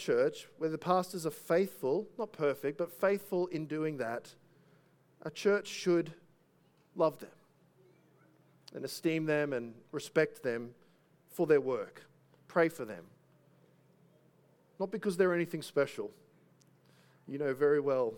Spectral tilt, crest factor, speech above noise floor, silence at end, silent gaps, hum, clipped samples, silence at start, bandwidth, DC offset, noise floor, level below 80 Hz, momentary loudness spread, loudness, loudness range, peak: -5.5 dB/octave; 22 dB; 36 dB; 0 s; none; none; under 0.1%; 0 s; 19 kHz; under 0.1%; -69 dBFS; -82 dBFS; 15 LU; -34 LUFS; 4 LU; -14 dBFS